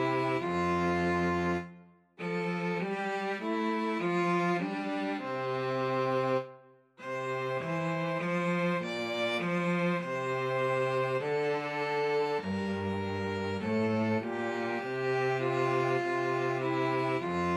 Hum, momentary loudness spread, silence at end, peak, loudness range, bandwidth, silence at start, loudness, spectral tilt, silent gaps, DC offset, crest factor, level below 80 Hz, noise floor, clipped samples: none; 5 LU; 0 s; -18 dBFS; 2 LU; 12 kHz; 0 s; -31 LUFS; -6.5 dB/octave; none; under 0.1%; 14 dB; -66 dBFS; -56 dBFS; under 0.1%